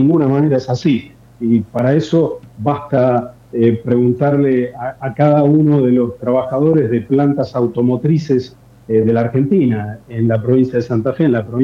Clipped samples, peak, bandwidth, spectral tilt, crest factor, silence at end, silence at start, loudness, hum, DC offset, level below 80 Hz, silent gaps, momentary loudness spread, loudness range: under 0.1%; 0 dBFS; 7.4 kHz; -9.5 dB/octave; 14 dB; 0 s; 0 s; -15 LUFS; none; under 0.1%; -50 dBFS; none; 7 LU; 2 LU